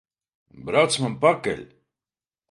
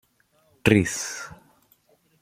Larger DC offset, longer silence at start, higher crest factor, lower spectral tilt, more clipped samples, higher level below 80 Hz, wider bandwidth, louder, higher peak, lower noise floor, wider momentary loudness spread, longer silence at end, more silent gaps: neither; about the same, 0.55 s vs 0.65 s; about the same, 22 dB vs 26 dB; about the same, -4 dB/octave vs -5 dB/octave; neither; second, -60 dBFS vs -50 dBFS; second, 11.5 kHz vs 16 kHz; about the same, -22 LUFS vs -23 LUFS; about the same, -4 dBFS vs -2 dBFS; first, under -90 dBFS vs -64 dBFS; second, 13 LU vs 17 LU; about the same, 0.85 s vs 0.9 s; neither